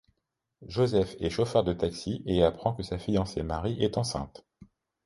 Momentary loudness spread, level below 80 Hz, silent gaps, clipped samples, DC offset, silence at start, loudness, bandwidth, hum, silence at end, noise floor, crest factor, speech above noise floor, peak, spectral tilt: 9 LU; -46 dBFS; none; under 0.1%; under 0.1%; 0.6 s; -29 LUFS; 11.5 kHz; none; 0.4 s; -81 dBFS; 20 dB; 52 dB; -8 dBFS; -6.5 dB/octave